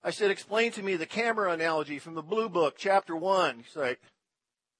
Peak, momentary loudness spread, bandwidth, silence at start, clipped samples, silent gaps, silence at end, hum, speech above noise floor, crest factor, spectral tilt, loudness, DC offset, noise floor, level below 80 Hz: -12 dBFS; 7 LU; 10.5 kHz; 0.05 s; under 0.1%; none; 0.85 s; none; 60 dB; 18 dB; -4 dB/octave; -29 LUFS; under 0.1%; -89 dBFS; -84 dBFS